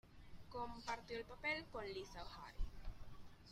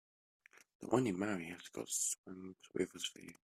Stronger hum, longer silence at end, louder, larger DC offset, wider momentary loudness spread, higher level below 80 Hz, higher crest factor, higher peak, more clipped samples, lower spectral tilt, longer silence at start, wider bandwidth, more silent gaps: neither; about the same, 0 s vs 0.1 s; second, -49 LUFS vs -39 LUFS; neither; first, 19 LU vs 14 LU; first, -54 dBFS vs -78 dBFS; second, 18 dB vs 24 dB; second, -30 dBFS vs -16 dBFS; neither; about the same, -4.5 dB/octave vs -3.5 dB/octave; second, 0.05 s vs 0.55 s; about the same, 15 kHz vs 15.5 kHz; second, none vs 0.75-0.80 s, 2.18-2.24 s